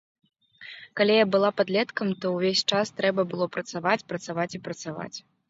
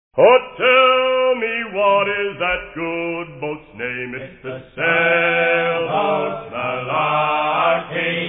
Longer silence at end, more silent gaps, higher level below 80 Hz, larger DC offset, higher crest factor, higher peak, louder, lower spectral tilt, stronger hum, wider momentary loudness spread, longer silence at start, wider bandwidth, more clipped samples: first, 0.3 s vs 0 s; neither; second, -70 dBFS vs -52 dBFS; neither; about the same, 18 dB vs 16 dB; second, -8 dBFS vs -2 dBFS; second, -25 LUFS vs -17 LUFS; second, -4.5 dB/octave vs -8 dB/octave; neither; about the same, 16 LU vs 15 LU; first, 0.6 s vs 0.15 s; first, 8 kHz vs 3.9 kHz; neither